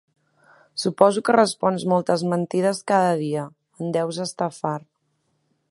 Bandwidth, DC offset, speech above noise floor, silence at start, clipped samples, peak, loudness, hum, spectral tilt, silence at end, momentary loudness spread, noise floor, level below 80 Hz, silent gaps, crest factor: 11.5 kHz; under 0.1%; 49 dB; 0.75 s; under 0.1%; 0 dBFS; -22 LUFS; none; -5.5 dB/octave; 0.9 s; 11 LU; -71 dBFS; -70 dBFS; none; 22 dB